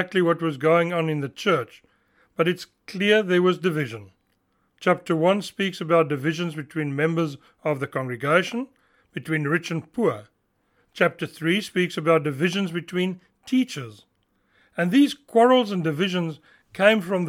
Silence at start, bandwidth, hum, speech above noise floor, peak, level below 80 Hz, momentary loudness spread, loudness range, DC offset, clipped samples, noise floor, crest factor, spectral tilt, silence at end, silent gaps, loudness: 0 s; 16 kHz; none; 46 dB; -4 dBFS; -72 dBFS; 13 LU; 3 LU; under 0.1%; under 0.1%; -69 dBFS; 20 dB; -6 dB/octave; 0 s; none; -23 LUFS